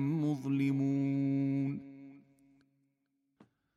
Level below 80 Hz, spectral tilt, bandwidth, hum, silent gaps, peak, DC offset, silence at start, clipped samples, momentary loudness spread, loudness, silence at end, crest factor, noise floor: -78 dBFS; -9 dB/octave; 7.2 kHz; none; none; -22 dBFS; under 0.1%; 0 s; under 0.1%; 14 LU; -33 LUFS; 1.6 s; 14 dB; -81 dBFS